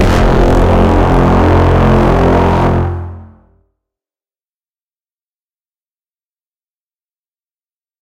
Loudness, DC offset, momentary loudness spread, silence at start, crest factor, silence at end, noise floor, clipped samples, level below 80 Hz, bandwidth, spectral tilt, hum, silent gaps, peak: -10 LUFS; under 0.1%; 6 LU; 0 s; 12 dB; 4.75 s; under -90 dBFS; under 0.1%; -18 dBFS; 10.5 kHz; -8 dB/octave; none; none; 0 dBFS